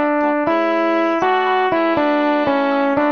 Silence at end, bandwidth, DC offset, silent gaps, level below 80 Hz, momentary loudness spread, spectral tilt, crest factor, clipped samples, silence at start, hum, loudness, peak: 0 s; 6.6 kHz; 0.3%; none; -56 dBFS; 1 LU; -6 dB/octave; 12 dB; under 0.1%; 0 s; none; -17 LUFS; -4 dBFS